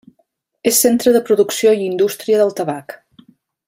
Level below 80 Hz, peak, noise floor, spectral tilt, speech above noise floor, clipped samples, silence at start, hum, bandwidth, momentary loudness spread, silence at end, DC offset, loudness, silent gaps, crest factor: -62 dBFS; 0 dBFS; -64 dBFS; -3.5 dB/octave; 50 dB; under 0.1%; 0.65 s; none; 16 kHz; 11 LU; 0.7 s; under 0.1%; -15 LUFS; none; 16 dB